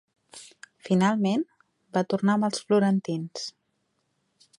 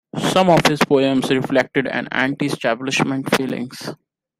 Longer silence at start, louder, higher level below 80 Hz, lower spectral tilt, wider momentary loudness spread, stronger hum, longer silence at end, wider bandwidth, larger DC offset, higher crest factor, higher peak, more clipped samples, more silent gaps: first, 0.35 s vs 0.15 s; second, -26 LUFS vs -18 LUFS; second, -72 dBFS vs -54 dBFS; about the same, -6 dB/octave vs -5 dB/octave; first, 22 LU vs 11 LU; neither; first, 1.1 s vs 0.45 s; second, 11.5 kHz vs 16 kHz; neither; about the same, 18 dB vs 18 dB; second, -10 dBFS vs 0 dBFS; neither; neither